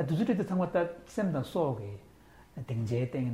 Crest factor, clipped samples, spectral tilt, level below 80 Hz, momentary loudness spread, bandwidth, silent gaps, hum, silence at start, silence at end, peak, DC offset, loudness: 14 dB; under 0.1%; -8 dB/octave; -62 dBFS; 15 LU; 15 kHz; none; none; 0 s; 0 s; -16 dBFS; under 0.1%; -32 LUFS